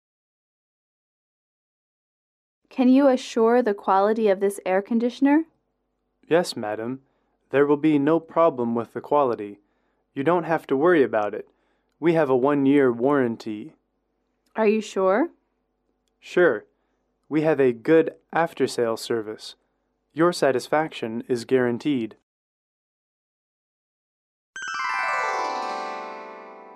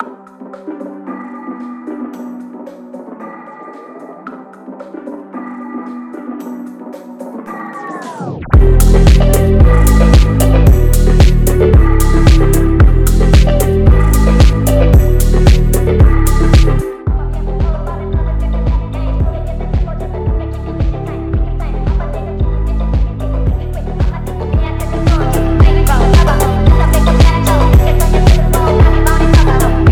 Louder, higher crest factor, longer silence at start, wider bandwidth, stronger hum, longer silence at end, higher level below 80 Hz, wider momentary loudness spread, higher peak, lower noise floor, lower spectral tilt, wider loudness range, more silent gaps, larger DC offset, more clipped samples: second, -22 LUFS vs -12 LUFS; first, 18 dB vs 10 dB; first, 2.75 s vs 0 s; second, 13.5 kHz vs 18.5 kHz; neither; about the same, 0 s vs 0 s; second, -74 dBFS vs -12 dBFS; second, 16 LU vs 19 LU; second, -6 dBFS vs 0 dBFS; first, -74 dBFS vs -32 dBFS; about the same, -6 dB/octave vs -6.5 dB/octave; second, 8 LU vs 17 LU; first, 22.23-24.53 s vs none; neither; second, under 0.1% vs 0.4%